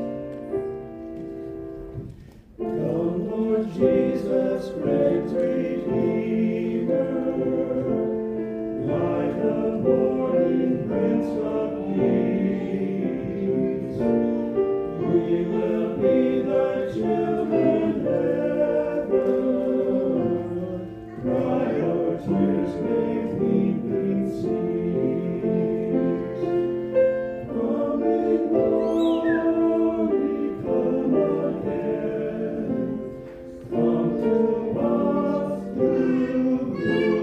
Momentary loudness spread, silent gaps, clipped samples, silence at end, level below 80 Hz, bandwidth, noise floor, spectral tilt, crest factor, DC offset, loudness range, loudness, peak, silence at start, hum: 8 LU; none; under 0.1%; 0 s; -52 dBFS; 8.2 kHz; -44 dBFS; -9.5 dB/octave; 16 dB; under 0.1%; 3 LU; -24 LUFS; -8 dBFS; 0 s; none